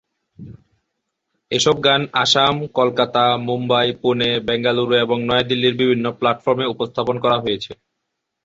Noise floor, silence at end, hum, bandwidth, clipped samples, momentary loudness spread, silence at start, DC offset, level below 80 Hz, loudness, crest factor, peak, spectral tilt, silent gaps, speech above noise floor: -77 dBFS; 0.7 s; none; 8.2 kHz; under 0.1%; 6 LU; 0.4 s; under 0.1%; -54 dBFS; -18 LUFS; 18 dB; -2 dBFS; -4.5 dB/octave; none; 59 dB